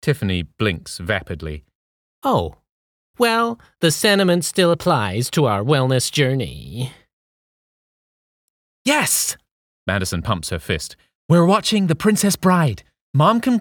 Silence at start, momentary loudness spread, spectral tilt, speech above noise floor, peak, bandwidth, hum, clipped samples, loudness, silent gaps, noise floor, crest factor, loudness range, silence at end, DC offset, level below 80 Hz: 0.05 s; 14 LU; -4.5 dB/octave; over 72 dB; -4 dBFS; over 20 kHz; none; under 0.1%; -19 LUFS; 1.75-2.22 s, 2.72-3.14 s, 7.13-8.85 s, 9.51-9.86 s, 11.15-11.29 s, 13.01-13.14 s; under -90 dBFS; 16 dB; 6 LU; 0 s; under 0.1%; -46 dBFS